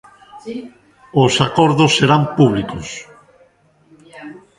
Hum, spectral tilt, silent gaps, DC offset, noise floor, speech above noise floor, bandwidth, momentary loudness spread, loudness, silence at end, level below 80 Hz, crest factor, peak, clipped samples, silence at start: none; -5.5 dB/octave; none; under 0.1%; -53 dBFS; 39 dB; 11.5 kHz; 23 LU; -14 LUFS; 0.2 s; -48 dBFS; 18 dB; 0 dBFS; under 0.1%; 0.35 s